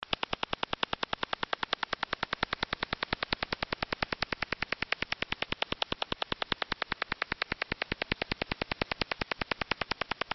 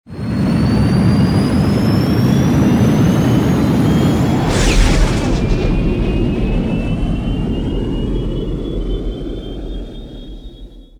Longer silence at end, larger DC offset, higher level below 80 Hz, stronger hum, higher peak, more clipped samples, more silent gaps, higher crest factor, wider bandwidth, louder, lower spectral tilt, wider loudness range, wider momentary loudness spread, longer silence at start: second, 0 s vs 0.15 s; neither; second, -52 dBFS vs -22 dBFS; neither; second, -12 dBFS vs 0 dBFS; neither; neither; first, 24 dB vs 14 dB; second, 6.2 kHz vs 15.5 kHz; second, -34 LUFS vs -15 LUFS; second, -1 dB/octave vs -7 dB/octave; second, 0 LU vs 9 LU; second, 1 LU vs 14 LU; about the same, 0.1 s vs 0.1 s